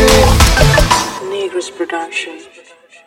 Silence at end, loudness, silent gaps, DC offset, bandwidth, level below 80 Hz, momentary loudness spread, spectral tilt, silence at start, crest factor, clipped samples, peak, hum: 0.65 s; -13 LUFS; none; under 0.1%; 17 kHz; -18 dBFS; 12 LU; -4 dB/octave; 0 s; 12 dB; 0.4%; 0 dBFS; none